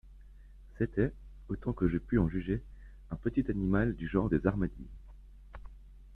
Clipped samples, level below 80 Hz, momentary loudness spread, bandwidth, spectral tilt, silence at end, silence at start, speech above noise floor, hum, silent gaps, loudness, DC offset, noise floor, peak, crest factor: under 0.1%; -44 dBFS; 22 LU; 4.1 kHz; -10.5 dB/octave; 0 s; 0.05 s; 21 dB; none; none; -33 LUFS; under 0.1%; -53 dBFS; -12 dBFS; 22 dB